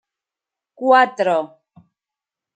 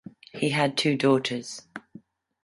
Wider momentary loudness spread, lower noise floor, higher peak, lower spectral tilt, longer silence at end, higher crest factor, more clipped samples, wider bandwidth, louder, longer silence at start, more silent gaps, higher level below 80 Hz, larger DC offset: second, 11 LU vs 21 LU; first, -88 dBFS vs -52 dBFS; first, -2 dBFS vs -8 dBFS; about the same, -5 dB/octave vs -5 dB/octave; first, 1.1 s vs 0.45 s; about the same, 18 dB vs 18 dB; neither; second, 9 kHz vs 11.5 kHz; first, -17 LUFS vs -25 LUFS; first, 0.8 s vs 0.35 s; neither; second, -78 dBFS vs -70 dBFS; neither